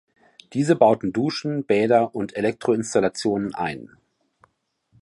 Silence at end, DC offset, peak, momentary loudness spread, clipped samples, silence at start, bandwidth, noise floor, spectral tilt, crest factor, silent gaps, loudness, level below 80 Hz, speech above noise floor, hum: 1.2 s; under 0.1%; -2 dBFS; 10 LU; under 0.1%; 0.5 s; 11.5 kHz; -69 dBFS; -6 dB/octave; 20 dB; none; -22 LUFS; -60 dBFS; 48 dB; none